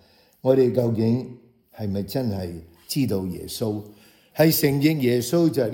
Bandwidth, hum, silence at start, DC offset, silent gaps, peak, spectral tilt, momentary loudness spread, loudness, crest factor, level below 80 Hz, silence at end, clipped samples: 17.5 kHz; none; 0.45 s; under 0.1%; none; -4 dBFS; -6 dB/octave; 15 LU; -23 LUFS; 18 dB; -60 dBFS; 0 s; under 0.1%